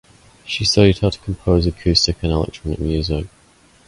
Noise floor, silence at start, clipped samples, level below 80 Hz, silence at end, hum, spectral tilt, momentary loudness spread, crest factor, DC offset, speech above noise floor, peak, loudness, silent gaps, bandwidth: -52 dBFS; 0.45 s; under 0.1%; -30 dBFS; 0.6 s; none; -5.5 dB/octave; 11 LU; 18 dB; under 0.1%; 34 dB; 0 dBFS; -18 LUFS; none; 11.5 kHz